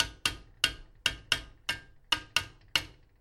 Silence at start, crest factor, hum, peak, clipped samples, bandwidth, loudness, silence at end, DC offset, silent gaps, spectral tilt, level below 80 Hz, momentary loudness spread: 0 s; 30 dB; none; -6 dBFS; under 0.1%; 16.5 kHz; -32 LUFS; 0.3 s; under 0.1%; none; -0.5 dB/octave; -52 dBFS; 7 LU